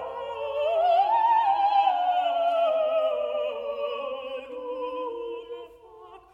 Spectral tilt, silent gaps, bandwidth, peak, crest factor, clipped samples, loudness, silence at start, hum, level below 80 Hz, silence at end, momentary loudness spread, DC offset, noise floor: -4 dB/octave; none; 7.4 kHz; -12 dBFS; 14 dB; under 0.1%; -25 LUFS; 0 s; none; -68 dBFS; 0.15 s; 14 LU; under 0.1%; -48 dBFS